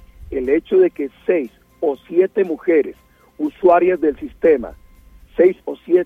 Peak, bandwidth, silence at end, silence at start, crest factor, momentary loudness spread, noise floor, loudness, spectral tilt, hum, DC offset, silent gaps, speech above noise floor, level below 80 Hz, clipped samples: -2 dBFS; 3.7 kHz; 0 s; 0.2 s; 16 dB; 13 LU; -45 dBFS; -18 LUFS; -8.5 dB/octave; none; under 0.1%; none; 29 dB; -46 dBFS; under 0.1%